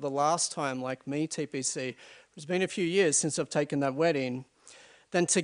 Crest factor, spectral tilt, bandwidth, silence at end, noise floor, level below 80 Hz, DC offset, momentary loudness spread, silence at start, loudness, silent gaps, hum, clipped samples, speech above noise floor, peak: 18 dB; -3.5 dB/octave; 10.5 kHz; 0 s; -55 dBFS; -76 dBFS; under 0.1%; 10 LU; 0 s; -29 LUFS; none; none; under 0.1%; 26 dB; -12 dBFS